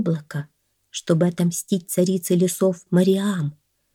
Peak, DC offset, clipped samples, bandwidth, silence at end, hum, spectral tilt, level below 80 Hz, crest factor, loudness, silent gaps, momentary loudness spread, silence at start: -6 dBFS; under 0.1%; under 0.1%; 17 kHz; 0.4 s; none; -6 dB/octave; -70 dBFS; 16 dB; -21 LUFS; none; 14 LU; 0 s